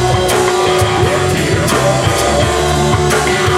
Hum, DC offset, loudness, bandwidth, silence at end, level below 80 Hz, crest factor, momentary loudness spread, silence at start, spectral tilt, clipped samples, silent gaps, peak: none; under 0.1%; -12 LUFS; 16.5 kHz; 0 s; -28 dBFS; 12 dB; 1 LU; 0 s; -4.5 dB/octave; under 0.1%; none; 0 dBFS